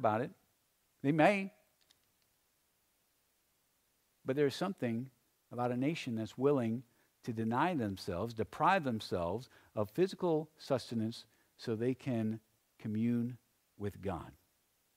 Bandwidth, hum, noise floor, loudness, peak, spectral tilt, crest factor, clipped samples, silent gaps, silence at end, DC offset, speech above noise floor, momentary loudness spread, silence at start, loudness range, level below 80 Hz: 16 kHz; none; -77 dBFS; -36 LUFS; -14 dBFS; -7 dB/octave; 24 dB; under 0.1%; none; 0.65 s; under 0.1%; 42 dB; 15 LU; 0 s; 6 LU; -70 dBFS